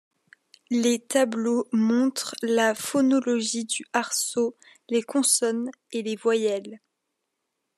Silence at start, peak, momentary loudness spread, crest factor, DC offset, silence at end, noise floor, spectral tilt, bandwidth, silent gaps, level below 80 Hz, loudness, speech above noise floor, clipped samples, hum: 0.7 s; -6 dBFS; 8 LU; 18 dB; under 0.1%; 1 s; -80 dBFS; -3 dB/octave; 14 kHz; none; -84 dBFS; -24 LUFS; 56 dB; under 0.1%; none